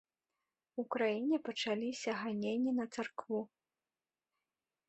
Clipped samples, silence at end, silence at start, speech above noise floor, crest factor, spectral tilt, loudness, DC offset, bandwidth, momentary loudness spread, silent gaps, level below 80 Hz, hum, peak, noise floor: under 0.1%; 1.45 s; 0.75 s; over 53 dB; 18 dB; -4.5 dB/octave; -38 LUFS; under 0.1%; 8.2 kHz; 8 LU; none; -84 dBFS; none; -20 dBFS; under -90 dBFS